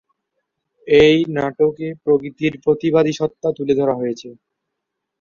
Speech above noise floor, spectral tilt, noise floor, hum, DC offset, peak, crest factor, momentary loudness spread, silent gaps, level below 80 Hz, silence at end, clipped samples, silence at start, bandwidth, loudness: 62 dB; -6.5 dB/octave; -79 dBFS; none; under 0.1%; -2 dBFS; 16 dB; 11 LU; none; -52 dBFS; 0.85 s; under 0.1%; 0.85 s; 7.2 kHz; -17 LUFS